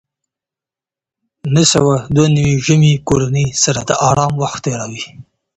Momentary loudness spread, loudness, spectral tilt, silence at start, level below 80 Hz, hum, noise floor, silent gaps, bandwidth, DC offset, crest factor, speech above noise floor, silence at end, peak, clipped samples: 12 LU; -13 LUFS; -5 dB/octave; 1.45 s; -42 dBFS; none; -88 dBFS; none; 8.8 kHz; under 0.1%; 14 dB; 75 dB; 0.35 s; 0 dBFS; under 0.1%